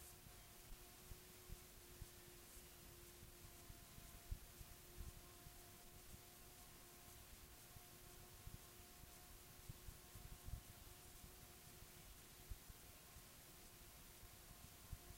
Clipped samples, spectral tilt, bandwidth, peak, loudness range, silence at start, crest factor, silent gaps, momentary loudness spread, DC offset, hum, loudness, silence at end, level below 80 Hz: under 0.1%; -3 dB/octave; 16 kHz; -36 dBFS; 1 LU; 0 s; 24 dB; none; 3 LU; under 0.1%; none; -60 LUFS; 0 s; -64 dBFS